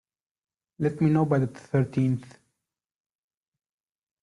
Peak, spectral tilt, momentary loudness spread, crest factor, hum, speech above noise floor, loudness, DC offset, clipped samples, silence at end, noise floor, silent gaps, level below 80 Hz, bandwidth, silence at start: -10 dBFS; -9.5 dB/octave; 7 LU; 18 dB; none; 60 dB; -26 LUFS; under 0.1%; under 0.1%; 1.95 s; -84 dBFS; none; -64 dBFS; 11 kHz; 0.8 s